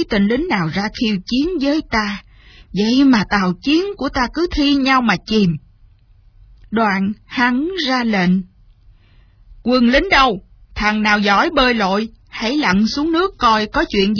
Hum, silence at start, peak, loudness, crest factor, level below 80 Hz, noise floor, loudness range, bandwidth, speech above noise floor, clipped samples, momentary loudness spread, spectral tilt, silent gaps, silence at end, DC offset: none; 0 s; 0 dBFS; -16 LUFS; 16 dB; -38 dBFS; -49 dBFS; 4 LU; 5.4 kHz; 33 dB; under 0.1%; 8 LU; -5.5 dB/octave; none; 0 s; under 0.1%